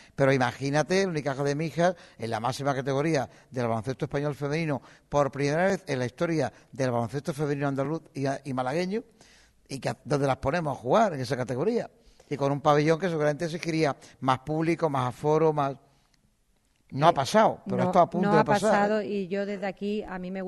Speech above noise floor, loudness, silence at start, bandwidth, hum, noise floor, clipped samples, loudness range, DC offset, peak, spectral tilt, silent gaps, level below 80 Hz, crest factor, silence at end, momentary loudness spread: 41 dB; -27 LUFS; 0.2 s; 12 kHz; none; -68 dBFS; under 0.1%; 5 LU; under 0.1%; -6 dBFS; -6 dB/octave; none; -58 dBFS; 22 dB; 0 s; 9 LU